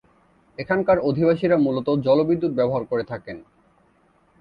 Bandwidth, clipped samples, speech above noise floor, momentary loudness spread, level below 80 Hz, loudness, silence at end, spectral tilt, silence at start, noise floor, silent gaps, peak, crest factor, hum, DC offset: 5.2 kHz; under 0.1%; 40 dB; 17 LU; -56 dBFS; -21 LUFS; 1 s; -9.5 dB/octave; 0.6 s; -60 dBFS; none; -6 dBFS; 16 dB; none; under 0.1%